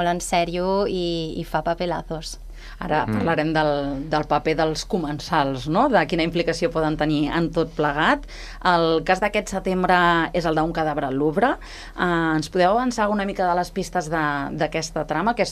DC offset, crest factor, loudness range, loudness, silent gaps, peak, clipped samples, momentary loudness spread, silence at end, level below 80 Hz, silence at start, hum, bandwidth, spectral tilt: under 0.1%; 18 dB; 3 LU; -22 LUFS; none; -4 dBFS; under 0.1%; 7 LU; 0 s; -40 dBFS; 0 s; none; 14.5 kHz; -5 dB/octave